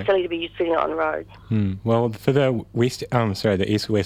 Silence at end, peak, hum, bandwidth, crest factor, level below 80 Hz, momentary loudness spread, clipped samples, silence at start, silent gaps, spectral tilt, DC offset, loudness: 0 s; -4 dBFS; none; 15.5 kHz; 18 dB; -52 dBFS; 5 LU; under 0.1%; 0 s; none; -6.5 dB/octave; under 0.1%; -22 LUFS